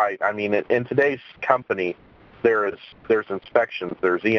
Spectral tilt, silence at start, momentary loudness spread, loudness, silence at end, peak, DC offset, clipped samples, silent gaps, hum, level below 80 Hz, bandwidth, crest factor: -7.5 dB/octave; 0 s; 7 LU; -23 LUFS; 0 s; 0 dBFS; under 0.1%; under 0.1%; none; none; -62 dBFS; 6.6 kHz; 22 dB